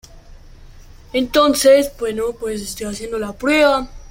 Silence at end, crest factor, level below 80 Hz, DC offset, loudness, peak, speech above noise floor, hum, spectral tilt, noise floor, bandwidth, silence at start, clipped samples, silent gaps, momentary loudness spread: 0 s; 16 dB; -40 dBFS; under 0.1%; -17 LUFS; -2 dBFS; 23 dB; none; -3 dB/octave; -40 dBFS; 16.5 kHz; 0.15 s; under 0.1%; none; 13 LU